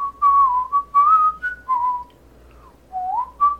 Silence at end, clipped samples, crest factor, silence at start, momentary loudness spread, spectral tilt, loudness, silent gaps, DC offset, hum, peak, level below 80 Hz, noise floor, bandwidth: 0 s; under 0.1%; 12 dB; 0 s; 14 LU; -4.5 dB/octave; -18 LUFS; none; under 0.1%; none; -8 dBFS; -50 dBFS; -48 dBFS; 5 kHz